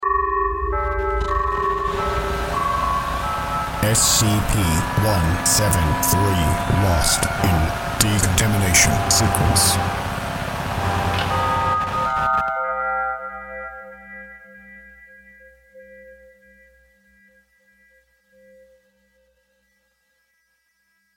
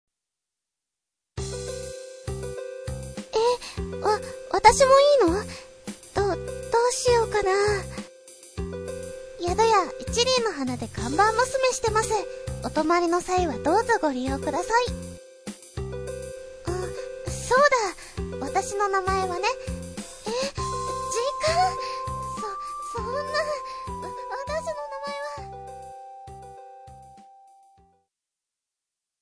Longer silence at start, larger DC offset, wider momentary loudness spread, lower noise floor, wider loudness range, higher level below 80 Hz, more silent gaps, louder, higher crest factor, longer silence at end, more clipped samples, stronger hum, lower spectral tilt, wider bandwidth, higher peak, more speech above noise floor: second, 0 s vs 1.35 s; neither; second, 10 LU vs 18 LU; second, -67 dBFS vs -87 dBFS; second, 9 LU vs 12 LU; first, -32 dBFS vs -44 dBFS; neither; first, -19 LUFS vs -25 LUFS; about the same, 22 dB vs 24 dB; first, 5 s vs 1.95 s; neither; neither; about the same, -3.5 dB/octave vs -4 dB/octave; first, 17 kHz vs 11 kHz; about the same, 0 dBFS vs -2 dBFS; second, 49 dB vs 65 dB